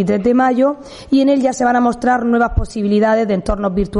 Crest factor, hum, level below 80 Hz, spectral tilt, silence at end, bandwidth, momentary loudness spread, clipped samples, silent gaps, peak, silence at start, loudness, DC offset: 12 dB; none; -30 dBFS; -6.5 dB/octave; 0 s; 11 kHz; 5 LU; under 0.1%; none; -2 dBFS; 0 s; -15 LUFS; under 0.1%